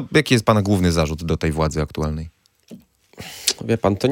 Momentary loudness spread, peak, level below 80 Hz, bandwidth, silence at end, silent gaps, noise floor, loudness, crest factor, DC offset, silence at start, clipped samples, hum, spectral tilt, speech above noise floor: 15 LU; 0 dBFS; -38 dBFS; 17 kHz; 0 s; none; -45 dBFS; -20 LUFS; 20 dB; under 0.1%; 0 s; under 0.1%; none; -5 dB/octave; 26 dB